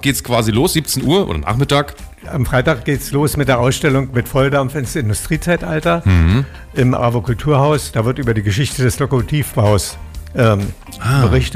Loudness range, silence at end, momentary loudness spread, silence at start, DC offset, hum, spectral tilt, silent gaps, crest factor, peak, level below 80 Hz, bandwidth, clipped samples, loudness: 1 LU; 0 s; 6 LU; 0 s; under 0.1%; none; -5.5 dB/octave; none; 12 dB; -4 dBFS; -30 dBFS; 16 kHz; under 0.1%; -16 LUFS